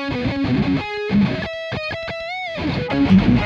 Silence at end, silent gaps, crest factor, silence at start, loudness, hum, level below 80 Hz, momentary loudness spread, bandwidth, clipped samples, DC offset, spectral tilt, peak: 0 s; none; 16 dB; 0 s; -20 LUFS; none; -36 dBFS; 11 LU; 7.2 kHz; under 0.1%; under 0.1%; -7.5 dB/octave; -2 dBFS